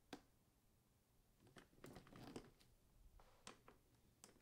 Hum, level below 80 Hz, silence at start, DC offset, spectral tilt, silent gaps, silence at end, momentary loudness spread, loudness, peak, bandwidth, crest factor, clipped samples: none; -76 dBFS; 0 s; under 0.1%; -4 dB/octave; none; 0 s; 9 LU; -63 LUFS; -36 dBFS; 15.5 kHz; 30 dB; under 0.1%